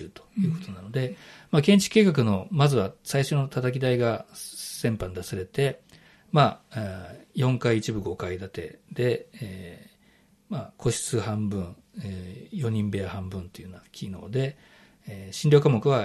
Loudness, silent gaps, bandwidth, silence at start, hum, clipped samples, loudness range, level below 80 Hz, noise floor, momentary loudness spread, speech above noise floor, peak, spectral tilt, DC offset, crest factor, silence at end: -26 LUFS; none; 13 kHz; 0 s; none; under 0.1%; 9 LU; -56 dBFS; -61 dBFS; 19 LU; 35 dB; -6 dBFS; -6 dB/octave; under 0.1%; 20 dB; 0 s